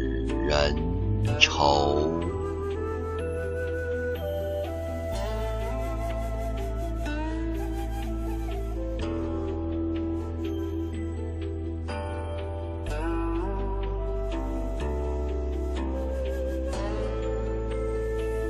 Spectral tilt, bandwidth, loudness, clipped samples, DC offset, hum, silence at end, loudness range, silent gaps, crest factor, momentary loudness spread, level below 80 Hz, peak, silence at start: -6 dB/octave; 13.5 kHz; -29 LUFS; under 0.1%; under 0.1%; none; 0 s; 6 LU; none; 26 dB; 8 LU; -32 dBFS; -2 dBFS; 0 s